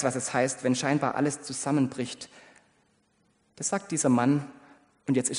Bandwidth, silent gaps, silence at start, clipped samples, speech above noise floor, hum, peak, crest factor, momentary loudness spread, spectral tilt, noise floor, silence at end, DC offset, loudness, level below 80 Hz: 10.5 kHz; none; 0 s; under 0.1%; 41 dB; none; -10 dBFS; 18 dB; 13 LU; -4.5 dB/octave; -69 dBFS; 0 s; under 0.1%; -27 LUFS; -72 dBFS